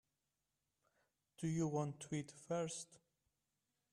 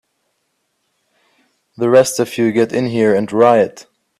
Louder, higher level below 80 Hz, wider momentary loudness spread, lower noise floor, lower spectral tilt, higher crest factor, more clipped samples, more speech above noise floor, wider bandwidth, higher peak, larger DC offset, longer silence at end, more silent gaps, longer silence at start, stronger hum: second, -44 LUFS vs -14 LUFS; second, -80 dBFS vs -60 dBFS; first, 8 LU vs 5 LU; first, -90 dBFS vs -68 dBFS; about the same, -6 dB/octave vs -5.5 dB/octave; about the same, 18 dB vs 16 dB; neither; second, 47 dB vs 55 dB; second, 12 kHz vs 14.5 kHz; second, -28 dBFS vs 0 dBFS; neither; first, 0.95 s vs 0.4 s; neither; second, 1.4 s vs 1.8 s; neither